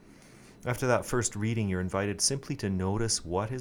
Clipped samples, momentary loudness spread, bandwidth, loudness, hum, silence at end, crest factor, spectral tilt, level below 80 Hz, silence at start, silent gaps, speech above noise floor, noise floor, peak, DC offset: under 0.1%; 6 LU; 18 kHz; -30 LUFS; none; 0 s; 22 dB; -4 dB/octave; -50 dBFS; 0.1 s; none; 24 dB; -53 dBFS; -10 dBFS; under 0.1%